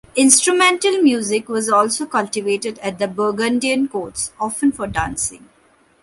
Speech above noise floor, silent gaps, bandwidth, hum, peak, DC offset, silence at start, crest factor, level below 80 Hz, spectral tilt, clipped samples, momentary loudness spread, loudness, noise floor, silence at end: 37 dB; none; 14.5 kHz; none; 0 dBFS; under 0.1%; 0.15 s; 18 dB; -46 dBFS; -2.5 dB/octave; under 0.1%; 11 LU; -17 LUFS; -55 dBFS; 0.65 s